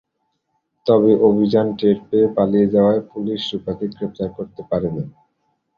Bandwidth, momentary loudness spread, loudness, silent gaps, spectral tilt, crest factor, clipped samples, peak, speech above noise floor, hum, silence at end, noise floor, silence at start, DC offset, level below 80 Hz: 6.8 kHz; 12 LU; -18 LUFS; none; -9 dB/octave; 16 dB; under 0.1%; -2 dBFS; 54 dB; none; 0.65 s; -72 dBFS; 0.85 s; under 0.1%; -52 dBFS